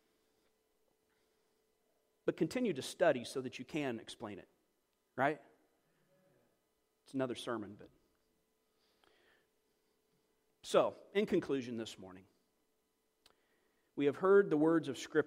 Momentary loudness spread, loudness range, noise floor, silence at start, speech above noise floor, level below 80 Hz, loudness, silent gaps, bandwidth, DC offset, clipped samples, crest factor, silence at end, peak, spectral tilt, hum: 19 LU; 10 LU; -81 dBFS; 2.25 s; 46 dB; -80 dBFS; -36 LUFS; none; 15.5 kHz; under 0.1%; under 0.1%; 22 dB; 0 s; -18 dBFS; -5.5 dB/octave; none